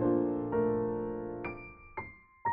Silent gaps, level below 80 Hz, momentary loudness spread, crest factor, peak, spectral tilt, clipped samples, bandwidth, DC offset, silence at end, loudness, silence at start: none; -56 dBFS; 14 LU; 14 dB; -18 dBFS; -9 dB/octave; under 0.1%; 3.4 kHz; under 0.1%; 0 s; -34 LUFS; 0 s